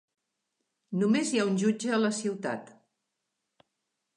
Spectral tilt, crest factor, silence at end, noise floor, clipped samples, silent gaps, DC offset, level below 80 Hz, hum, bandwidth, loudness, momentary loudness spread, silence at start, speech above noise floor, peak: -5 dB/octave; 18 dB; 1.5 s; -83 dBFS; under 0.1%; none; under 0.1%; -82 dBFS; none; 11 kHz; -29 LUFS; 10 LU; 0.9 s; 56 dB; -14 dBFS